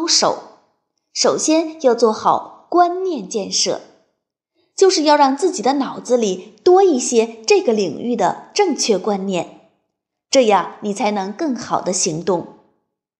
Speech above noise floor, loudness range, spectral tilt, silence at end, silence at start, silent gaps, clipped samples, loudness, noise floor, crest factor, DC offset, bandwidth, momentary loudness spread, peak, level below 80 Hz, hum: 59 dB; 4 LU; -3 dB/octave; 0.7 s; 0 s; none; under 0.1%; -17 LUFS; -75 dBFS; 16 dB; under 0.1%; 11.5 kHz; 10 LU; -2 dBFS; -68 dBFS; none